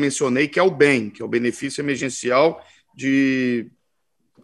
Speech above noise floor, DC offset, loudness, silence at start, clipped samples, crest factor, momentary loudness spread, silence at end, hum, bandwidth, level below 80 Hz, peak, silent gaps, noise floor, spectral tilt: 54 dB; under 0.1%; -20 LUFS; 0 s; under 0.1%; 20 dB; 9 LU; 0.75 s; none; 12 kHz; -66 dBFS; -2 dBFS; none; -74 dBFS; -4.5 dB/octave